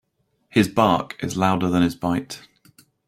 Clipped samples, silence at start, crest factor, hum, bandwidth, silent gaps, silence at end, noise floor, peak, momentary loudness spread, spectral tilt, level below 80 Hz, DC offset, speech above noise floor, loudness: under 0.1%; 0.55 s; 20 dB; none; 15.5 kHz; none; 0.7 s; -67 dBFS; -2 dBFS; 10 LU; -6 dB/octave; -54 dBFS; under 0.1%; 47 dB; -21 LUFS